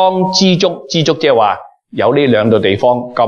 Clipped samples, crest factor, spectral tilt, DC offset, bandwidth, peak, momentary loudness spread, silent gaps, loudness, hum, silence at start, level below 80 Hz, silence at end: under 0.1%; 12 dB; -5 dB/octave; under 0.1%; 7.4 kHz; 0 dBFS; 5 LU; none; -12 LUFS; none; 0 s; -54 dBFS; 0 s